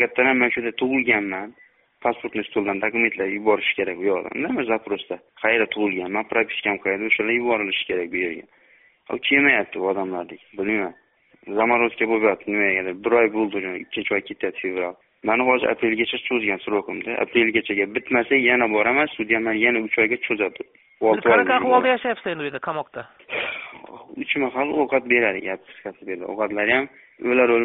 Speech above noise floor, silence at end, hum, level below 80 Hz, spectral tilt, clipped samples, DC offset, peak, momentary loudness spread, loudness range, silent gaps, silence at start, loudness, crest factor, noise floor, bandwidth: 34 dB; 0 s; none; -62 dBFS; -2 dB/octave; under 0.1%; under 0.1%; -4 dBFS; 13 LU; 4 LU; none; 0 s; -21 LUFS; 18 dB; -56 dBFS; 4 kHz